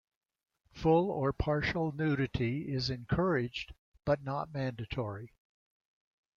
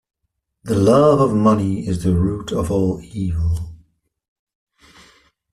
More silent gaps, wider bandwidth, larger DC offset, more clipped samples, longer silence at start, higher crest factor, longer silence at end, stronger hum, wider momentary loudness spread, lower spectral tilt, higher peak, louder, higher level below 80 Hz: first, 3.79-3.92 s vs none; second, 7.2 kHz vs 13 kHz; neither; neither; about the same, 0.75 s vs 0.65 s; about the same, 18 dB vs 16 dB; second, 1.1 s vs 1.8 s; neither; about the same, 11 LU vs 12 LU; about the same, -7.5 dB/octave vs -8 dB/octave; second, -16 dBFS vs -2 dBFS; second, -33 LUFS vs -18 LUFS; second, -52 dBFS vs -38 dBFS